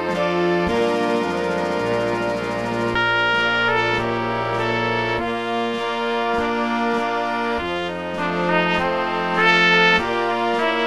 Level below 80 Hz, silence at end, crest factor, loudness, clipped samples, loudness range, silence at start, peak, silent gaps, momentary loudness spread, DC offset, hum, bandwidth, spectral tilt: -48 dBFS; 0 s; 18 dB; -20 LUFS; under 0.1%; 4 LU; 0 s; -2 dBFS; none; 7 LU; 0.4%; none; 13.5 kHz; -5 dB/octave